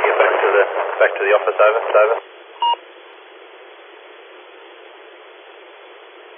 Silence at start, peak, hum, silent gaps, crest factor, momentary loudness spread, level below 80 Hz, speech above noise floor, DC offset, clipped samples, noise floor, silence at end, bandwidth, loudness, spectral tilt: 0 s; 0 dBFS; none; none; 18 dB; 9 LU; under -90 dBFS; 25 dB; under 0.1%; under 0.1%; -41 dBFS; 0.45 s; 3.7 kHz; -16 LUFS; -4 dB/octave